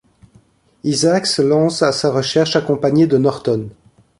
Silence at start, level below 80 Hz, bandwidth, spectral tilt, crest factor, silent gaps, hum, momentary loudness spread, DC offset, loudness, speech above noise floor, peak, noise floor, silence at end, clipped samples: 0.85 s; -54 dBFS; 11.5 kHz; -5 dB/octave; 16 dB; none; none; 7 LU; under 0.1%; -16 LUFS; 37 dB; -2 dBFS; -52 dBFS; 0.5 s; under 0.1%